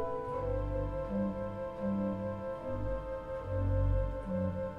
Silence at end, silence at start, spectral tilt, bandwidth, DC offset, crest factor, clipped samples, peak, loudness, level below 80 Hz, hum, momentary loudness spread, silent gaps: 0 s; 0 s; -10 dB/octave; 5.4 kHz; under 0.1%; 14 dB; under 0.1%; -22 dBFS; -36 LUFS; -42 dBFS; none; 7 LU; none